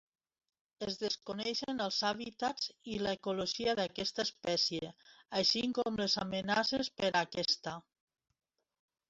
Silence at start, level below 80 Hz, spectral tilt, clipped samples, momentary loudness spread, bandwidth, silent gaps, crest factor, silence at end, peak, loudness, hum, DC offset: 0.8 s; -68 dBFS; -3.5 dB/octave; under 0.1%; 7 LU; 8 kHz; none; 20 dB; 1.3 s; -16 dBFS; -35 LUFS; none; under 0.1%